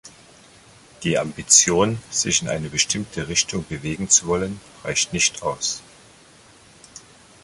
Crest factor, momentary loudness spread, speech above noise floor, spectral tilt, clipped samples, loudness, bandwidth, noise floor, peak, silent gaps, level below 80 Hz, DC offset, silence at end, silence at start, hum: 22 dB; 14 LU; 28 dB; -2 dB/octave; under 0.1%; -20 LUFS; 11.5 kHz; -50 dBFS; -2 dBFS; none; -50 dBFS; under 0.1%; 0.45 s; 0.05 s; none